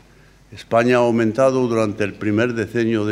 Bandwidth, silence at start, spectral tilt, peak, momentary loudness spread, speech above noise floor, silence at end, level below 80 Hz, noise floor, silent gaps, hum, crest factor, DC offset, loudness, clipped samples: 12.5 kHz; 0.5 s; -6.5 dB/octave; -2 dBFS; 5 LU; 31 dB; 0 s; -54 dBFS; -49 dBFS; none; none; 16 dB; under 0.1%; -18 LUFS; under 0.1%